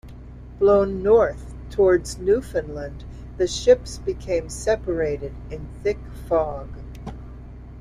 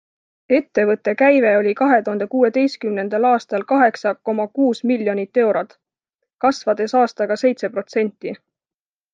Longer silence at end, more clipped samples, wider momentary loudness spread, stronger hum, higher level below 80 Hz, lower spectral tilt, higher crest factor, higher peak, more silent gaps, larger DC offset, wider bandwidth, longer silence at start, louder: second, 0 s vs 0.75 s; neither; first, 21 LU vs 8 LU; neither; first, -38 dBFS vs -70 dBFS; about the same, -5.5 dB/octave vs -6 dB/octave; about the same, 18 dB vs 18 dB; about the same, -4 dBFS vs -2 dBFS; second, none vs 6.15-6.19 s; neither; first, 14 kHz vs 7.6 kHz; second, 0.05 s vs 0.5 s; second, -22 LUFS vs -18 LUFS